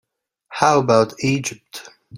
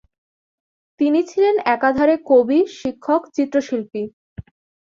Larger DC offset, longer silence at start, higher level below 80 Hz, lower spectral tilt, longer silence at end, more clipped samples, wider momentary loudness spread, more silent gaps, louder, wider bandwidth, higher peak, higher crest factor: neither; second, 0.5 s vs 1 s; about the same, -58 dBFS vs -54 dBFS; about the same, -5 dB/octave vs -6 dB/octave; second, 0 s vs 0.45 s; neither; first, 21 LU vs 12 LU; second, none vs 4.13-4.36 s; about the same, -18 LUFS vs -18 LUFS; first, 16.5 kHz vs 7.6 kHz; about the same, 0 dBFS vs -2 dBFS; about the same, 20 dB vs 16 dB